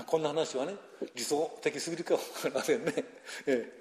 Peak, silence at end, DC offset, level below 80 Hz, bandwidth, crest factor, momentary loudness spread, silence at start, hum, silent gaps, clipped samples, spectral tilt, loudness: -14 dBFS; 0 s; under 0.1%; -80 dBFS; 14 kHz; 18 dB; 8 LU; 0 s; none; none; under 0.1%; -3.5 dB/octave; -33 LUFS